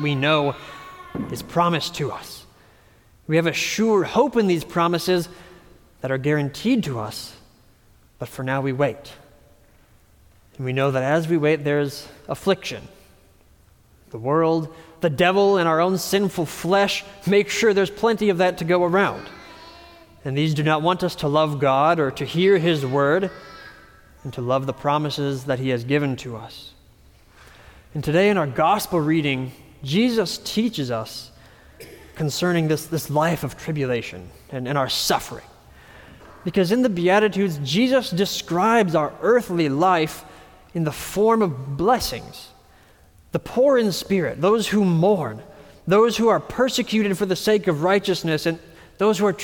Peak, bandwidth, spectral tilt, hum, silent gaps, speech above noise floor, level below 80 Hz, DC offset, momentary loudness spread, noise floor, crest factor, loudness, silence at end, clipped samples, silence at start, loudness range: -6 dBFS; 19 kHz; -5.5 dB/octave; none; none; 34 dB; -52 dBFS; under 0.1%; 17 LU; -54 dBFS; 16 dB; -21 LUFS; 0 s; under 0.1%; 0 s; 6 LU